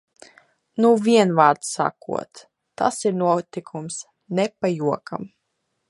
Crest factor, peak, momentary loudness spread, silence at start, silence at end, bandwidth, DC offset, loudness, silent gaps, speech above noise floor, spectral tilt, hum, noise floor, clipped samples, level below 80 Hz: 22 dB; -2 dBFS; 17 LU; 0.75 s; 0.6 s; 11.5 kHz; under 0.1%; -21 LUFS; none; 54 dB; -5 dB/octave; none; -75 dBFS; under 0.1%; -68 dBFS